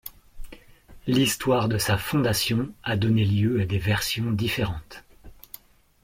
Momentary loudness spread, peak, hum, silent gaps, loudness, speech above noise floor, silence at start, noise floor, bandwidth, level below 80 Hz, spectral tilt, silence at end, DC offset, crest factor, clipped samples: 21 LU; -10 dBFS; none; none; -24 LUFS; 25 dB; 0.05 s; -49 dBFS; 16.5 kHz; -46 dBFS; -5 dB/octave; 0.7 s; under 0.1%; 16 dB; under 0.1%